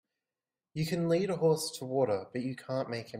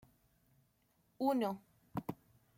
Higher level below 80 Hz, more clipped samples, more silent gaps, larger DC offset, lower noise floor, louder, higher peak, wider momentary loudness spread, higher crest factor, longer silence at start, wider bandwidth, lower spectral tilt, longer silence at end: about the same, -70 dBFS vs -74 dBFS; neither; neither; neither; first, under -90 dBFS vs -76 dBFS; first, -32 LUFS vs -39 LUFS; first, -16 dBFS vs -22 dBFS; second, 9 LU vs 15 LU; second, 16 dB vs 22 dB; second, 0.75 s vs 1.2 s; about the same, 16 kHz vs 16.5 kHz; second, -5.5 dB/octave vs -7 dB/octave; second, 0 s vs 0.45 s